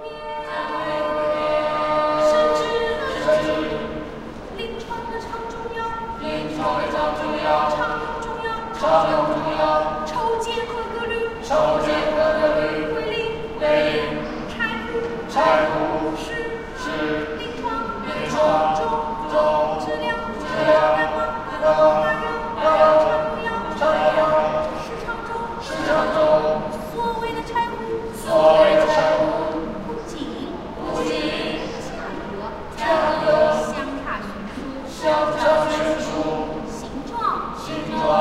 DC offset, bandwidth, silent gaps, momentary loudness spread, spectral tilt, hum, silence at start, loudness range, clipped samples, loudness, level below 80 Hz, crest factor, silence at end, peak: under 0.1%; 13 kHz; none; 12 LU; -5 dB/octave; none; 0 s; 5 LU; under 0.1%; -21 LUFS; -42 dBFS; 18 dB; 0 s; -2 dBFS